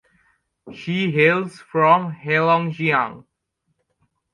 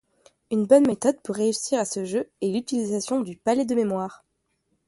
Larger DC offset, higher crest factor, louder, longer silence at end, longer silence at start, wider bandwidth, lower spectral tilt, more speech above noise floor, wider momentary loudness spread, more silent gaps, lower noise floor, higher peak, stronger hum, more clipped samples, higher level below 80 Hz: neither; about the same, 20 dB vs 20 dB; first, -19 LUFS vs -24 LUFS; first, 1.15 s vs 0.75 s; first, 0.65 s vs 0.5 s; about the same, 11 kHz vs 11.5 kHz; first, -7 dB/octave vs -5 dB/octave; first, 54 dB vs 49 dB; about the same, 10 LU vs 10 LU; neither; about the same, -73 dBFS vs -73 dBFS; about the same, -2 dBFS vs -4 dBFS; neither; neither; about the same, -66 dBFS vs -68 dBFS